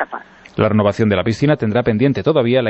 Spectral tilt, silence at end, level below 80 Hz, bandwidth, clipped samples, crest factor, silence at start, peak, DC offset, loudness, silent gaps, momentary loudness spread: -7.5 dB/octave; 0 s; -46 dBFS; 8.2 kHz; under 0.1%; 14 dB; 0 s; -2 dBFS; under 0.1%; -16 LUFS; none; 10 LU